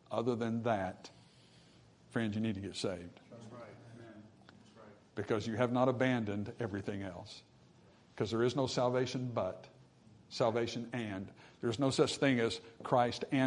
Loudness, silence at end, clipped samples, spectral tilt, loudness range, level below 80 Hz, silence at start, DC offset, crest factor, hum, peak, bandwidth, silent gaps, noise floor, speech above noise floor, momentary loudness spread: -35 LUFS; 0 s; under 0.1%; -5.5 dB/octave; 7 LU; -74 dBFS; 0.1 s; under 0.1%; 20 dB; none; -16 dBFS; 11 kHz; none; -63 dBFS; 28 dB; 21 LU